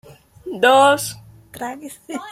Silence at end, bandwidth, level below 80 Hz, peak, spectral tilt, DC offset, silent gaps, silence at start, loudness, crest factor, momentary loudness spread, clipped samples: 0 s; 16.5 kHz; -58 dBFS; -2 dBFS; -2.5 dB/octave; under 0.1%; none; 0.45 s; -15 LUFS; 18 dB; 21 LU; under 0.1%